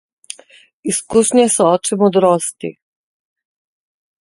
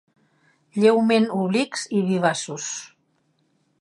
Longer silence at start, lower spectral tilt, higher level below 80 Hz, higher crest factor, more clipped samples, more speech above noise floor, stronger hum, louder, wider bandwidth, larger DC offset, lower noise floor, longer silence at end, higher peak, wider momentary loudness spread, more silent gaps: about the same, 0.85 s vs 0.75 s; about the same, -4.5 dB/octave vs -5 dB/octave; first, -58 dBFS vs -74 dBFS; about the same, 16 dB vs 18 dB; neither; second, 33 dB vs 46 dB; neither; first, -14 LUFS vs -22 LUFS; about the same, 12 kHz vs 11.5 kHz; neither; second, -47 dBFS vs -67 dBFS; first, 1.5 s vs 0.95 s; first, 0 dBFS vs -4 dBFS; first, 21 LU vs 12 LU; neither